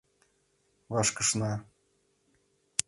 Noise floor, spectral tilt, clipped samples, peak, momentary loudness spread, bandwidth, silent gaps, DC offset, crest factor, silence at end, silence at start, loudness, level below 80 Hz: -72 dBFS; -3 dB/octave; under 0.1%; 0 dBFS; 9 LU; 11.5 kHz; none; under 0.1%; 34 dB; 0.05 s; 0.9 s; -29 LUFS; -64 dBFS